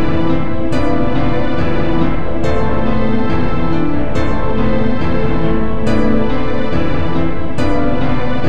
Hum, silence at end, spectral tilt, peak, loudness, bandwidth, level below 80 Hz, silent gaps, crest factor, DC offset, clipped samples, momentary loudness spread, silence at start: none; 0 s; -8 dB/octave; 0 dBFS; -17 LUFS; 9 kHz; -24 dBFS; none; 14 dB; 30%; under 0.1%; 2 LU; 0 s